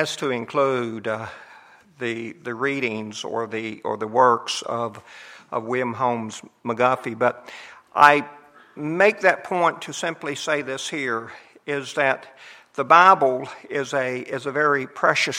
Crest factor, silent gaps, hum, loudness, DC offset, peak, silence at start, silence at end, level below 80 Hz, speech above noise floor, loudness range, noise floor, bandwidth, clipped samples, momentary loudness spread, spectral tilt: 22 dB; none; none; -22 LUFS; under 0.1%; 0 dBFS; 0 s; 0 s; -72 dBFS; 27 dB; 6 LU; -49 dBFS; 16 kHz; under 0.1%; 16 LU; -4 dB/octave